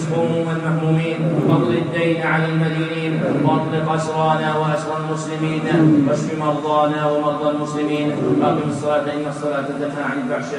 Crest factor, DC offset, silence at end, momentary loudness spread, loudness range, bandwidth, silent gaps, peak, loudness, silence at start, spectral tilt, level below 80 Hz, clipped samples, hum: 16 dB; under 0.1%; 0 s; 6 LU; 2 LU; 10.5 kHz; none; -2 dBFS; -19 LUFS; 0 s; -7 dB/octave; -58 dBFS; under 0.1%; none